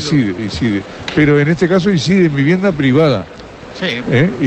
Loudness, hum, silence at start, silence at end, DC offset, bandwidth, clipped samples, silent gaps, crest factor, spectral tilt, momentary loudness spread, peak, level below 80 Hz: -14 LUFS; none; 0 s; 0 s; under 0.1%; 8.6 kHz; under 0.1%; none; 12 dB; -6.5 dB/octave; 9 LU; -2 dBFS; -40 dBFS